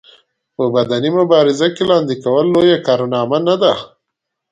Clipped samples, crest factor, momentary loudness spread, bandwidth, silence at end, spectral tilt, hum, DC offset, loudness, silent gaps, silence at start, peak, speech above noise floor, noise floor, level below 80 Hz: under 0.1%; 14 dB; 5 LU; 9 kHz; 0.65 s; -6 dB/octave; none; under 0.1%; -14 LUFS; none; 0.6 s; 0 dBFS; 64 dB; -77 dBFS; -56 dBFS